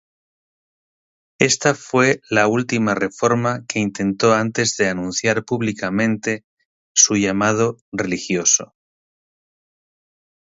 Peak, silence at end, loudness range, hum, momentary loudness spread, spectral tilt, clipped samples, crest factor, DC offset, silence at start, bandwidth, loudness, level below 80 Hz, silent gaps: 0 dBFS; 1.8 s; 2 LU; none; 7 LU; -3.5 dB/octave; under 0.1%; 20 dB; under 0.1%; 1.4 s; 8 kHz; -18 LUFS; -56 dBFS; 6.44-6.57 s, 6.66-6.95 s, 7.81-7.92 s